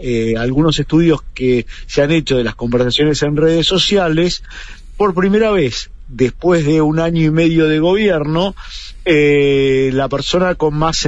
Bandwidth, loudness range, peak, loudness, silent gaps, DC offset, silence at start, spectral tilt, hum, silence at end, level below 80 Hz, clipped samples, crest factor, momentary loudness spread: 8.2 kHz; 1 LU; -2 dBFS; -14 LUFS; none; under 0.1%; 0 s; -5.5 dB/octave; none; 0 s; -32 dBFS; under 0.1%; 12 dB; 7 LU